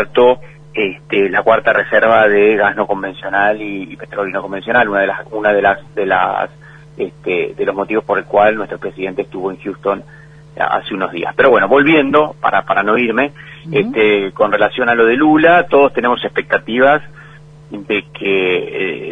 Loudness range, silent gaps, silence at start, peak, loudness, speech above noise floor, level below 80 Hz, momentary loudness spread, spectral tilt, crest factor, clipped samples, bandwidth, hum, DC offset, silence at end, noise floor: 5 LU; none; 0 s; 0 dBFS; -14 LUFS; 24 dB; -50 dBFS; 12 LU; -7 dB/octave; 14 dB; under 0.1%; 6.2 kHz; none; under 0.1%; 0 s; -38 dBFS